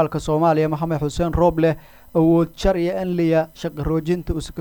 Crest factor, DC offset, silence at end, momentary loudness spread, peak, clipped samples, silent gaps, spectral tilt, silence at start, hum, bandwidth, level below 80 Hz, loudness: 14 dB; under 0.1%; 0 s; 7 LU; -6 dBFS; under 0.1%; none; -7.5 dB/octave; 0 s; none; 20 kHz; -34 dBFS; -20 LUFS